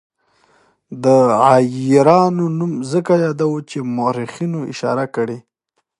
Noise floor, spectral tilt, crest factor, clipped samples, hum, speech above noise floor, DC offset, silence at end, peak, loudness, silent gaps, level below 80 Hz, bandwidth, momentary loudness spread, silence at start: -71 dBFS; -7 dB/octave; 16 dB; under 0.1%; none; 56 dB; under 0.1%; 0.6 s; 0 dBFS; -16 LUFS; none; -64 dBFS; 11.5 kHz; 12 LU; 0.9 s